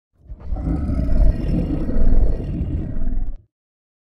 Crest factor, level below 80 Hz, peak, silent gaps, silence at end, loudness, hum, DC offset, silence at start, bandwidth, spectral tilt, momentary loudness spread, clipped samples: 14 dB; -20 dBFS; -4 dBFS; none; 0.75 s; -23 LUFS; none; under 0.1%; 0.3 s; 3 kHz; -10.5 dB/octave; 12 LU; under 0.1%